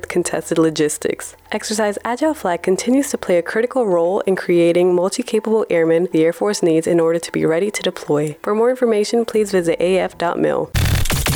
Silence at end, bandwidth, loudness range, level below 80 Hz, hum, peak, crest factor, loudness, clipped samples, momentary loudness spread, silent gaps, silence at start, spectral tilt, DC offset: 0 s; over 20 kHz; 3 LU; -34 dBFS; none; -6 dBFS; 10 dB; -18 LUFS; under 0.1%; 5 LU; none; 0.1 s; -5 dB/octave; under 0.1%